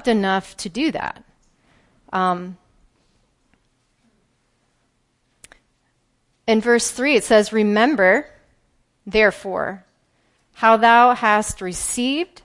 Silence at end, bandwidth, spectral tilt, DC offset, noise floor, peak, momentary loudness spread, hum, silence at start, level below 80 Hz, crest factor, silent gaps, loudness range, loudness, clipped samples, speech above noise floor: 0.2 s; 11.5 kHz; -3.5 dB/octave; under 0.1%; -66 dBFS; -2 dBFS; 15 LU; none; 0.05 s; -52 dBFS; 20 dB; none; 12 LU; -18 LUFS; under 0.1%; 49 dB